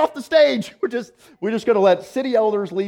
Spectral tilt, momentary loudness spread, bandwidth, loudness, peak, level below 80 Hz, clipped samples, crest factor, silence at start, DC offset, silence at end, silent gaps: -5.5 dB/octave; 10 LU; 15.5 kHz; -19 LUFS; -4 dBFS; -64 dBFS; under 0.1%; 16 dB; 0 s; under 0.1%; 0 s; none